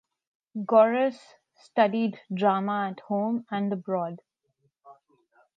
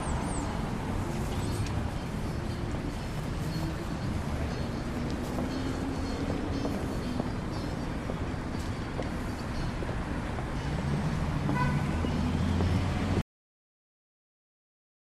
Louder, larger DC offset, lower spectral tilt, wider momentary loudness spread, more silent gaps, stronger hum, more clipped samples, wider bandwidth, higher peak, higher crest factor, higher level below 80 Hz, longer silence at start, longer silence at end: first, -26 LUFS vs -33 LUFS; neither; first, -8 dB/octave vs -6.5 dB/octave; first, 13 LU vs 6 LU; neither; neither; neither; second, 7.8 kHz vs 14 kHz; first, -8 dBFS vs -14 dBFS; about the same, 20 dB vs 18 dB; second, -84 dBFS vs -38 dBFS; first, 0.55 s vs 0 s; second, 0.65 s vs 2 s